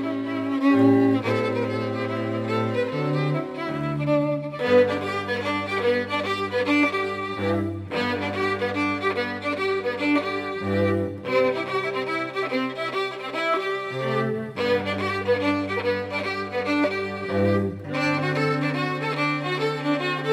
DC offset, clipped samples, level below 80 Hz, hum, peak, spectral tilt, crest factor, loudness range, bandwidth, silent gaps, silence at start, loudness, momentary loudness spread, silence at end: under 0.1%; under 0.1%; -64 dBFS; none; -6 dBFS; -6.5 dB/octave; 18 dB; 2 LU; 13 kHz; none; 0 s; -24 LUFS; 6 LU; 0 s